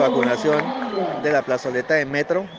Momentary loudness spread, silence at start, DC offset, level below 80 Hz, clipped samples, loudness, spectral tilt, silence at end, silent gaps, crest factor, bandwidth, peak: 6 LU; 0 s; under 0.1%; -62 dBFS; under 0.1%; -21 LUFS; -5.5 dB/octave; 0 s; none; 16 dB; 9.2 kHz; -4 dBFS